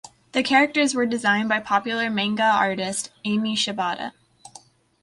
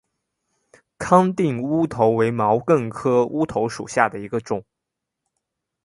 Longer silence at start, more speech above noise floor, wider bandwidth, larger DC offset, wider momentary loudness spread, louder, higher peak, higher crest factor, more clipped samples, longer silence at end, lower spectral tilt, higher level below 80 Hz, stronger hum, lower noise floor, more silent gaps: second, 0.05 s vs 1 s; second, 28 dB vs 63 dB; about the same, 11.5 kHz vs 11.5 kHz; neither; about the same, 9 LU vs 10 LU; about the same, -22 LUFS vs -20 LUFS; second, -6 dBFS vs 0 dBFS; about the same, 18 dB vs 22 dB; neither; second, 0.9 s vs 1.25 s; second, -3 dB/octave vs -7 dB/octave; second, -66 dBFS vs -56 dBFS; neither; second, -50 dBFS vs -83 dBFS; neither